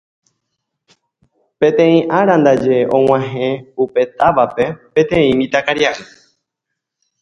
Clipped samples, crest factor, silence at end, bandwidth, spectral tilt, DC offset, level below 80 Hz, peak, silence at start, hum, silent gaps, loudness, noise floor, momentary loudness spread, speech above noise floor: under 0.1%; 16 dB; 1.2 s; 7.8 kHz; -6.5 dB/octave; under 0.1%; -50 dBFS; 0 dBFS; 1.6 s; none; none; -14 LUFS; -78 dBFS; 8 LU; 65 dB